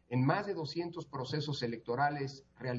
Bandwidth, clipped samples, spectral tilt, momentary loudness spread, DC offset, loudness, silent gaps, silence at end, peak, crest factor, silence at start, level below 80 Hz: 7.6 kHz; under 0.1%; -5 dB/octave; 10 LU; under 0.1%; -36 LUFS; none; 0 s; -16 dBFS; 20 dB; 0.1 s; -72 dBFS